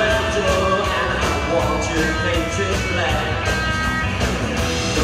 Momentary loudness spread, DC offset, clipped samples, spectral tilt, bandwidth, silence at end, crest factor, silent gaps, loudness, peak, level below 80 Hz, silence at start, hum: 3 LU; under 0.1%; under 0.1%; -4.5 dB/octave; 15.5 kHz; 0 s; 14 dB; none; -19 LUFS; -6 dBFS; -30 dBFS; 0 s; none